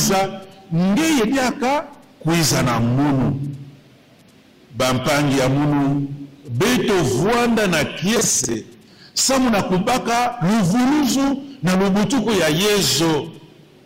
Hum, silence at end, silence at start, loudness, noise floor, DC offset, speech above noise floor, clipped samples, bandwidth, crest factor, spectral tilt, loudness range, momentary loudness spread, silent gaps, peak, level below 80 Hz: none; 0.4 s; 0 s; -18 LUFS; -49 dBFS; under 0.1%; 32 dB; under 0.1%; 16.5 kHz; 10 dB; -4.5 dB/octave; 3 LU; 10 LU; none; -8 dBFS; -44 dBFS